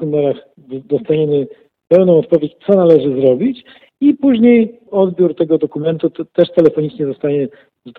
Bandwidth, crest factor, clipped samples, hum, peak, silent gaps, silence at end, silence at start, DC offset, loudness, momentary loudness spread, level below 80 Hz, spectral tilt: 4.6 kHz; 14 dB; 0.1%; none; 0 dBFS; none; 0.05 s; 0 s; under 0.1%; -14 LUFS; 10 LU; -58 dBFS; -10 dB/octave